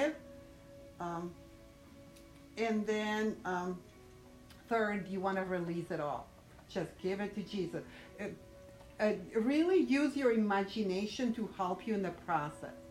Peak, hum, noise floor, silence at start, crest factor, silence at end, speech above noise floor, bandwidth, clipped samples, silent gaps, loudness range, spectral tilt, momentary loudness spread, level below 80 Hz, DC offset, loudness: -20 dBFS; none; -57 dBFS; 0 s; 18 dB; 0 s; 21 dB; 15 kHz; under 0.1%; none; 7 LU; -6 dB/octave; 24 LU; -64 dBFS; under 0.1%; -36 LUFS